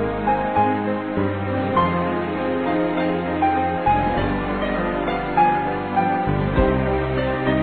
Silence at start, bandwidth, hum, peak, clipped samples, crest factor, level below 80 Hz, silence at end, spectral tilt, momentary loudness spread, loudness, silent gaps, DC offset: 0 s; 4.5 kHz; none; -4 dBFS; under 0.1%; 16 dB; -34 dBFS; 0 s; -9.5 dB/octave; 4 LU; -21 LUFS; none; 0.3%